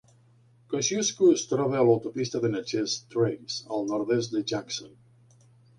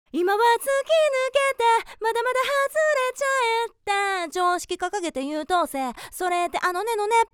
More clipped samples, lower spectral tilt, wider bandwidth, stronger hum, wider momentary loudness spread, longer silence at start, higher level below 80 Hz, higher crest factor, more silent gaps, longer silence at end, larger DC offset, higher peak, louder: neither; first, -4.5 dB/octave vs -1 dB/octave; second, 10.5 kHz vs 19.5 kHz; neither; first, 10 LU vs 7 LU; first, 0.7 s vs 0.15 s; second, -68 dBFS vs -60 dBFS; about the same, 18 dB vs 14 dB; neither; first, 0.9 s vs 0.1 s; neither; about the same, -8 dBFS vs -8 dBFS; second, -27 LUFS vs -23 LUFS